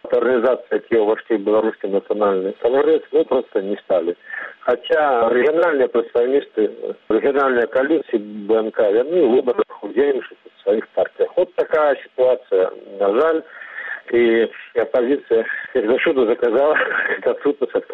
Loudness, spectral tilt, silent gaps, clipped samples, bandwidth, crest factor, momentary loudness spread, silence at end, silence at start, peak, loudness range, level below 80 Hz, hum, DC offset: -18 LUFS; -7.5 dB/octave; none; under 0.1%; 4.3 kHz; 12 dB; 7 LU; 0 s; 0.05 s; -6 dBFS; 2 LU; -62 dBFS; none; under 0.1%